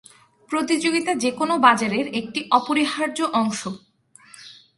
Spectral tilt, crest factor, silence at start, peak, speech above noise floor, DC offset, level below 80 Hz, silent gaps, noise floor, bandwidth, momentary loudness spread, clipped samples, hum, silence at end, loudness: -3.5 dB/octave; 22 dB; 0.5 s; 0 dBFS; 29 dB; under 0.1%; -66 dBFS; none; -50 dBFS; 11.5 kHz; 15 LU; under 0.1%; none; 0.25 s; -21 LUFS